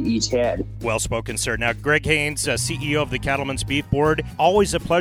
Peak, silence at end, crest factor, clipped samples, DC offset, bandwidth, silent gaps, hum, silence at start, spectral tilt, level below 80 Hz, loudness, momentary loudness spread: -4 dBFS; 0 s; 18 dB; under 0.1%; under 0.1%; 20 kHz; none; none; 0 s; -4 dB/octave; -36 dBFS; -21 LUFS; 6 LU